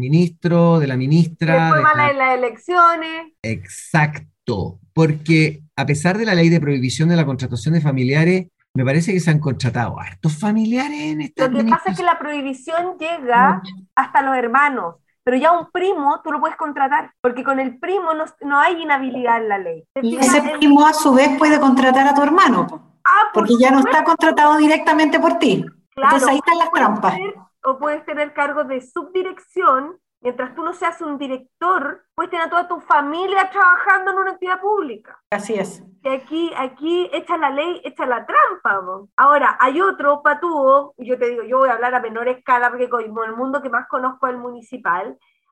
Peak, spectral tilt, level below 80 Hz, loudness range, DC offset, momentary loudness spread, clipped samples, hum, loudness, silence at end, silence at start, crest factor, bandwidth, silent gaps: -2 dBFS; -6 dB/octave; -60 dBFS; 8 LU; under 0.1%; 12 LU; under 0.1%; none; -17 LUFS; 0.4 s; 0 s; 14 dB; 12.5 kHz; 3.39-3.43 s, 8.69-8.74 s, 17.19-17.23 s, 25.87-25.91 s, 35.26-35.30 s, 39.12-39.18 s